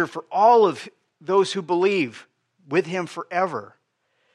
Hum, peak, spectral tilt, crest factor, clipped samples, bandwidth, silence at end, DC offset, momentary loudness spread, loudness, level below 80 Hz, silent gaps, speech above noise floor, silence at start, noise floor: none; -6 dBFS; -5.5 dB/octave; 18 dB; under 0.1%; 11 kHz; 0.7 s; under 0.1%; 17 LU; -21 LUFS; -82 dBFS; none; 49 dB; 0 s; -70 dBFS